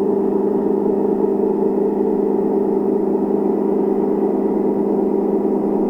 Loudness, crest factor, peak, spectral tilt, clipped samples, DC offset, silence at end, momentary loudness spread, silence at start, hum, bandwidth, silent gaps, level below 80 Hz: -18 LUFS; 12 dB; -4 dBFS; -11 dB/octave; under 0.1%; under 0.1%; 0 s; 1 LU; 0 s; none; 2.9 kHz; none; -54 dBFS